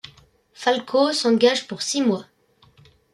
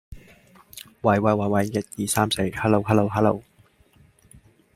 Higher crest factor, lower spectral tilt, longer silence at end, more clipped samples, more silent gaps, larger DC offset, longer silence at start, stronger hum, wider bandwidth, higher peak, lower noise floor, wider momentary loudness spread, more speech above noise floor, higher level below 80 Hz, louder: about the same, 18 dB vs 20 dB; second, -3.5 dB/octave vs -5.5 dB/octave; second, 0.9 s vs 1.35 s; neither; neither; neither; first, 0.6 s vs 0.1 s; neither; second, 12.5 kHz vs 16 kHz; about the same, -4 dBFS vs -4 dBFS; about the same, -56 dBFS vs -58 dBFS; second, 8 LU vs 13 LU; about the same, 37 dB vs 36 dB; second, -68 dBFS vs -52 dBFS; about the same, -21 LUFS vs -22 LUFS